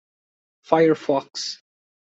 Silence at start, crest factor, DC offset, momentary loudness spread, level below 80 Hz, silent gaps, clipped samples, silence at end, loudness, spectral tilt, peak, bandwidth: 0.7 s; 22 dB; under 0.1%; 13 LU; -70 dBFS; none; under 0.1%; 0.65 s; -22 LUFS; -5 dB/octave; -2 dBFS; 8 kHz